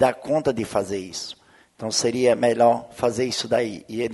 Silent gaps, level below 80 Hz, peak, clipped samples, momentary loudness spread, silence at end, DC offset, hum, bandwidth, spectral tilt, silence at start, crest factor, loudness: none; -58 dBFS; -6 dBFS; under 0.1%; 13 LU; 0 s; under 0.1%; none; 11.5 kHz; -4 dB/octave; 0 s; 18 dB; -22 LUFS